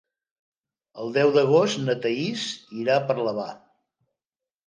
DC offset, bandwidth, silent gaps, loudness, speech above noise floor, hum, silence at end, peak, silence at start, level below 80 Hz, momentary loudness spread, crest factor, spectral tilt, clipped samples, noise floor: under 0.1%; 9.8 kHz; none; -23 LUFS; over 67 dB; none; 1.1 s; -8 dBFS; 0.95 s; -76 dBFS; 12 LU; 18 dB; -5 dB/octave; under 0.1%; under -90 dBFS